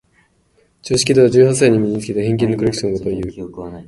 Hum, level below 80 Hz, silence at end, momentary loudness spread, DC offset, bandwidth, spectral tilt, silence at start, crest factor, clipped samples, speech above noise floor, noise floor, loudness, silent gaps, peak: none; -44 dBFS; 0.05 s; 16 LU; under 0.1%; 11.5 kHz; -5.5 dB/octave; 0.85 s; 16 dB; under 0.1%; 43 dB; -58 dBFS; -15 LUFS; none; 0 dBFS